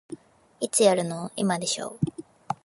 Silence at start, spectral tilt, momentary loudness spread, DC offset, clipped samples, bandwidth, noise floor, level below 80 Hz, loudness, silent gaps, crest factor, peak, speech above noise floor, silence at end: 0.1 s; -4 dB/octave; 23 LU; under 0.1%; under 0.1%; 12 kHz; -45 dBFS; -62 dBFS; -26 LUFS; none; 20 dB; -6 dBFS; 20 dB; 0.1 s